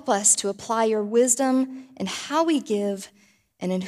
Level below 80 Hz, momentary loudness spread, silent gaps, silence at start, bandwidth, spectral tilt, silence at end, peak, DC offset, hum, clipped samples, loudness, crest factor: -72 dBFS; 14 LU; none; 0.05 s; 15.5 kHz; -3 dB/octave; 0 s; -6 dBFS; under 0.1%; none; under 0.1%; -22 LUFS; 18 dB